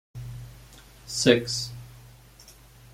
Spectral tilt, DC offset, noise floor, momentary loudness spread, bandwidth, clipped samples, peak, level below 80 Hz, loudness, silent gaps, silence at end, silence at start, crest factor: -4 dB/octave; under 0.1%; -51 dBFS; 26 LU; 16.5 kHz; under 0.1%; -4 dBFS; -52 dBFS; -24 LUFS; none; 0.1 s; 0.15 s; 26 dB